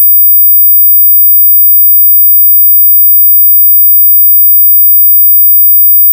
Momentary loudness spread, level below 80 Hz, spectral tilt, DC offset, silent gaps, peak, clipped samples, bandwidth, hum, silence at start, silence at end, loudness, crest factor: 0 LU; under -90 dBFS; 0.5 dB/octave; under 0.1%; none; 0 dBFS; 0.6%; 16 kHz; none; 0 s; 0 s; 0 LUFS; 4 dB